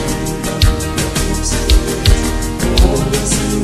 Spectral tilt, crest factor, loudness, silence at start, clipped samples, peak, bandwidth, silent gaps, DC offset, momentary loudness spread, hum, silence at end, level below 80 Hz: -4.5 dB/octave; 14 dB; -15 LUFS; 0 s; under 0.1%; 0 dBFS; 13.5 kHz; none; under 0.1%; 5 LU; none; 0 s; -16 dBFS